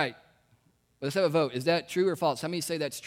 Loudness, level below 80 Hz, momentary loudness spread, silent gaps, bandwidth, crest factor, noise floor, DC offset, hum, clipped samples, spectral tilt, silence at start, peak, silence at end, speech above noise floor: -29 LUFS; -72 dBFS; 6 LU; none; 16.5 kHz; 18 dB; -67 dBFS; under 0.1%; none; under 0.1%; -4.5 dB/octave; 0 s; -12 dBFS; 0 s; 39 dB